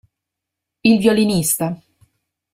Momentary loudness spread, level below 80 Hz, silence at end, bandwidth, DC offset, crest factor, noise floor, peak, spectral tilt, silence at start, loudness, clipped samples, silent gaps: 10 LU; -54 dBFS; 0.8 s; 16 kHz; under 0.1%; 18 dB; -82 dBFS; -2 dBFS; -4.5 dB/octave; 0.85 s; -16 LUFS; under 0.1%; none